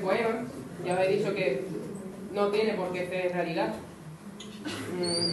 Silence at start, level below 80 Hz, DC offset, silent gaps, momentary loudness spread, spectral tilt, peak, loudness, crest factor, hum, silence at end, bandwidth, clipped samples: 0 s; -64 dBFS; under 0.1%; none; 14 LU; -4.5 dB/octave; -12 dBFS; -30 LUFS; 18 dB; none; 0 s; 12.5 kHz; under 0.1%